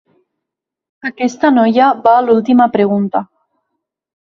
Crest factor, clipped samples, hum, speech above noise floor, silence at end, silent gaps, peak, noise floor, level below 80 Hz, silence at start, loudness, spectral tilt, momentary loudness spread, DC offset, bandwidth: 14 dB; under 0.1%; none; 69 dB; 1.1 s; none; 0 dBFS; -81 dBFS; -58 dBFS; 1.05 s; -12 LUFS; -6.5 dB/octave; 10 LU; under 0.1%; 7.4 kHz